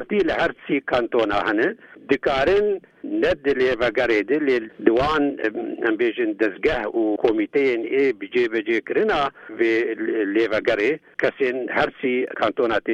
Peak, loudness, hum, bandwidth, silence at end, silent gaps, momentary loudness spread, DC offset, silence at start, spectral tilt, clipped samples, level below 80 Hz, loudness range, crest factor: -2 dBFS; -21 LUFS; none; 8 kHz; 0 s; none; 5 LU; under 0.1%; 0 s; -6 dB/octave; under 0.1%; -48 dBFS; 1 LU; 20 dB